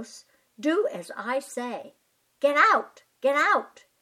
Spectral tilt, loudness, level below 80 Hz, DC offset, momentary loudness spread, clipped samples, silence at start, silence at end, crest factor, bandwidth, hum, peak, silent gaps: -3 dB/octave; -25 LUFS; -86 dBFS; under 0.1%; 19 LU; under 0.1%; 0 s; 0.35 s; 20 dB; 16 kHz; none; -6 dBFS; none